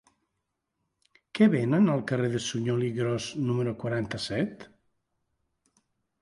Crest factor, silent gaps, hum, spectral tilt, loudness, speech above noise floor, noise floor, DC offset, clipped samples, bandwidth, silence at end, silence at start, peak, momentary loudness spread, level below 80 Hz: 20 dB; none; none; -6.5 dB/octave; -27 LUFS; 55 dB; -82 dBFS; under 0.1%; under 0.1%; 11.5 kHz; 1.55 s; 1.35 s; -8 dBFS; 8 LU; -64 dBFS